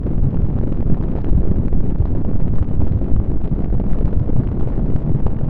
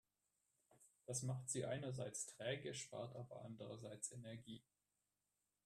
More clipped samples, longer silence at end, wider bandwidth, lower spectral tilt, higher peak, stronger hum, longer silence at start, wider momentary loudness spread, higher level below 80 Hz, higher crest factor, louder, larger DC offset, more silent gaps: neither; second, 0 s vs 1.05 s; second, 2.4 kHz vs 13.5 kHz; first, -12.5 dB/octave vs -4 dB/octave; first, 0 dBFS vs -32 dBFS; second, none vs 50 Hz at -90 dBFS; second, 0 s vs 0.7 s; second, 2 LU vs 11 LU; first, -20 dBFS vs -82 dBFS; second, 12 dB vs 20 dB; first, -20 LUFS vs -49 LUFS; neither; neither